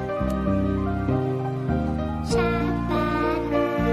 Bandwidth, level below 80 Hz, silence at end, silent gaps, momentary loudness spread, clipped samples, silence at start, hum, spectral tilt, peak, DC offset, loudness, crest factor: 14.5 kHz; -36 dBFS; 0 s; none; 3 LU; under 0.1%; 0 s; none; -7.5 dB/octave; -10 dBFS; under 0.1%; -24 LUFS; 12 dB